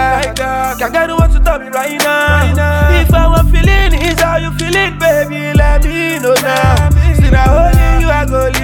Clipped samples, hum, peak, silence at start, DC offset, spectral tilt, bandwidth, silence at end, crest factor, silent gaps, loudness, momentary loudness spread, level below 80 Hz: under 0.1%; none; 0 dBFS; 0 s; under 0.1%; -5.5 dB/octave; 18.5 kHz; 0 s; 10 dB; none; -11 LUFS; 5 LU; -12 dBFS